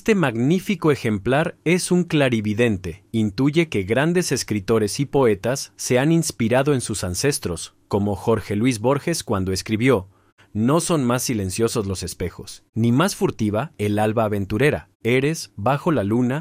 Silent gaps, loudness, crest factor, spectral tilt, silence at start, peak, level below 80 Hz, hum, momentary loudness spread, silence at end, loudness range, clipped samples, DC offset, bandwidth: 10.32-10.37 s, 12.69-12.73 s, 14.95-15.00 s; -21 LUFS; 16 dB; -5.5 dB/octave; 0.05 s; -4 dBFS; -48 dBFS; none; 6 LU; 0 s; 2 LU; under 0.1%; under 0.1%; 16 kHz